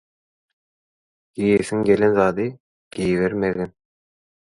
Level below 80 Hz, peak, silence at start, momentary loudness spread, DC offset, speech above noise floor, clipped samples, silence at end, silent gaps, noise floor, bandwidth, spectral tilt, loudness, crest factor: -52 dBFS; -4 dBFS; 1.35 s; 13 LU; under 0.1%; over 71 dB; under 0.1%; 0.9 s; 2.60-2.91 s; under -90 dBFS; 11.5 kHz; -7 dB/octave; -20 LUFS; 20 dB